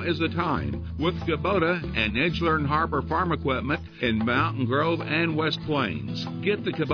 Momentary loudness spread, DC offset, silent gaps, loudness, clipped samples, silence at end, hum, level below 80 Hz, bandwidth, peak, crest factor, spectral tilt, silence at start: 5 LU; under 0.1%; none; -25 LUFS; under 0.1%; 0 s; none; -42 dBFS; 5.4 kHz; -10 dBFS; 16 dB; -7.5 dB/octave; 0 s